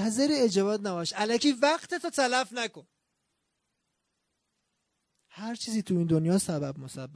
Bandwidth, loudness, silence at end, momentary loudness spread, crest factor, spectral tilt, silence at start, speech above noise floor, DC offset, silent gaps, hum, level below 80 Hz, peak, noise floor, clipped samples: 11 kHz; -28 LUFS; 0 s; 11 LU; 18 dB; -4.5 dB/octave; 0 s; 52 dB; under 0.1%; none; none; -70 dBFS; -12 dBFS; -80 dBFS; under 0.1%